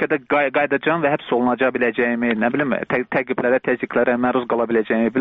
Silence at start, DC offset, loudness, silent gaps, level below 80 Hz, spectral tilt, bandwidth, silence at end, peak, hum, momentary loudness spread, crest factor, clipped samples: 0 s; under 0.1%; -19 LUFS; none; -58 dBFS; -4 dB/octave; 4.6 kHz; 0 s; -6 dBFS; none; 3 LU; 14 dB; under 0.1%